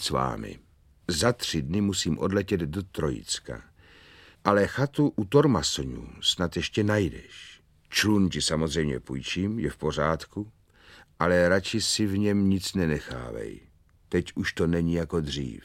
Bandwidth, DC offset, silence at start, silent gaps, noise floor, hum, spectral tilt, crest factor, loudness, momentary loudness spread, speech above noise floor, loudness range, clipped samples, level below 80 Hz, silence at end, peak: 16 kHz; under 0.1%; 0 s; none; -54 dBFS; none; -4.5 dB/octave; 24 dB; -26 LUFS; 14 LU; 28 dB; 3 LU; under 0.1%; -46 dBFS; 0.05 s; -4 dBFS